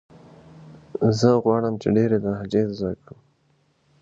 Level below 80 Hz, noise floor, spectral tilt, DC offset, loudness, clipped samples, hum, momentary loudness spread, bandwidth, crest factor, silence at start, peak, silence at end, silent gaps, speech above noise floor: -54 dBFS; -64 dBFS; -7.5 dB/octave; under 0.1%; -22 LUFS; under 0.1%; none; 12 LU; 7.8 kHz; 20 dB; 0.6 s; -4 dBFS; 1.05 s; none; 43 dB